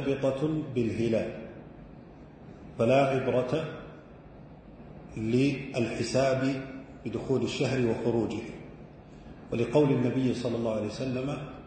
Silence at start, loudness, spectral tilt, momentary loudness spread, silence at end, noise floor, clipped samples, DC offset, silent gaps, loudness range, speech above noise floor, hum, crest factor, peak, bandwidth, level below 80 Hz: 0 s; -29 LUFS; -7 dB/octave; 24 LU; 0 s; -49 dBFS; under 0.1%; under 0.1%; none; 2 LU; 21 dB; none; 18 dB; -10 dBFS; 9.2 kHz; -56 dBFS